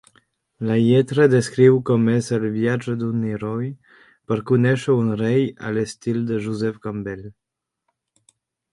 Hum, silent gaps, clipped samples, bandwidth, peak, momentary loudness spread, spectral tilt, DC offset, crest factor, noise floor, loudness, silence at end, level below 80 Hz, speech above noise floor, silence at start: none; none; under 0.1%; 11.5 kHz; -2 dBFS; 13 LU; -7.5 dB/octave; under 0.1%; 18 dB; -76 dBFS; -20 LUFS; 1.4 s; -58 dBFS; 56 dB; 0.6 s